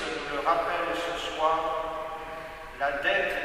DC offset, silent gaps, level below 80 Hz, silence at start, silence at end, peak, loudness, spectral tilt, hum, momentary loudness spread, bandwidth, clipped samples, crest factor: under 0.1%; none; -52 dBFS; 0 s; 0 s; -12 dBFS; -29 LUFS; -3 dB/octave; none; 12 LU; 15.5 kHz; under 0.1%; 18 dB